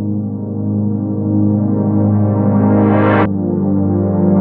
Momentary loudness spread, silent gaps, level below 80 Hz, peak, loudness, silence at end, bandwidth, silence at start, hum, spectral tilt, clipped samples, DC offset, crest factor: 7 LU; none; -48 dBFS; -2 dBFS; -14 LUFS; 0 s; 3.8 kHz; 0 s; 50 Hz at -45 dBFS; -13 dB/octave; under 0.1%; under 0.1%; 12 dB